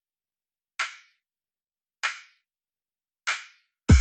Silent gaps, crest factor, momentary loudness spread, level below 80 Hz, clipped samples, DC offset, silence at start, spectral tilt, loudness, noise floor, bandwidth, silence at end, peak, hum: none; 22 dB; 14 LU; -38 dBFS; under 0.1%; under 0.1%; 0.8 s; -5 dB/octave; -30 LUFS; under -90 dBFS; 9 kHz; 0 s; -6 dBFS; none